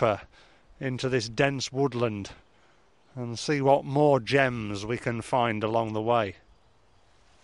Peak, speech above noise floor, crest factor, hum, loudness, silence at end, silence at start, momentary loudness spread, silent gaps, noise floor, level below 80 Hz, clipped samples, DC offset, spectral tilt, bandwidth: -8 dBFS; 36 dB; 20 dB; none; -27 LUFS; 1.1 s; 0 s; 13 LU; none; -63 dBFS; -58 dBFS; under 0.1%; under 0.1%; -5.5 dB/octave; 11.5 kHz